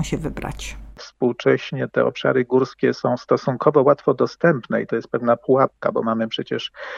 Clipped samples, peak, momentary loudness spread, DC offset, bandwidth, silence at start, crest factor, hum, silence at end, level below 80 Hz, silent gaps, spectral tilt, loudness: under 0.1%; -2 dBFS; 11 LU; under 0.1%; 12 kHz; 0 s; 18 dB; none; 0 s; -44 dBFS; none; -6.5 dB/octave; -20 LUFS